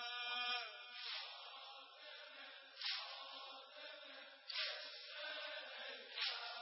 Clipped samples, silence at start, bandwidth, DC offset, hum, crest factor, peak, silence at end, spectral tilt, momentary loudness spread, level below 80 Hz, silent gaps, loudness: under 0.1%; 0 s; 5.8 kHz; under 0.1%; none; 20 dB; -28 dBFS; 0 s; 7.5 dB/octave; 13 LU; under -90 dBFS; none; -47 LUFS